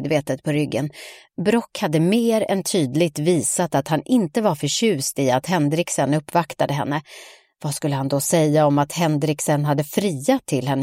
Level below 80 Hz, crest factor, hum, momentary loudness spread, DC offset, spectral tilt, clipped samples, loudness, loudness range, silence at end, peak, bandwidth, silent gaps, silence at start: -60 dBFS; 16 dB; none; 7 LU; under 0.1%; -5 dB/octave; under 0.1%; -21 LUFS; 2 LU; 0 s; -4 dBFS; 16.5 kHz; none; 0 s